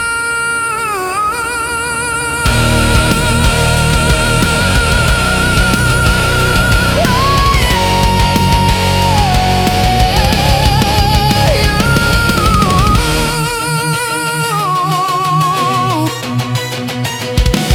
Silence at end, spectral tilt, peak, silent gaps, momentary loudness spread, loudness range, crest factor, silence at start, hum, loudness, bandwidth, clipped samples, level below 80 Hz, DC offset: 0 s; -4 dB/octave; 0 dBFS; none; 5 LU; 3 LU; 12 dB; 0 s; none; -12 LUFS; 18 kHz; under 0.1%; -20 dBFS; under 0.1%